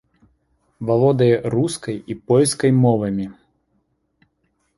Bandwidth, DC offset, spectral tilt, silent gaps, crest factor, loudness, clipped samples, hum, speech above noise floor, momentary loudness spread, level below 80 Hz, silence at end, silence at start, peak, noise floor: 11.5 kHz; under 0.1%; -6.5 dB/octave; none; 16 dB; -18 LUFS; under 0.1%; none; 50 dB; 13 LU; -54 dBFS; 1.45 s; 0.8 s; -4 dBFS; -68 dBFS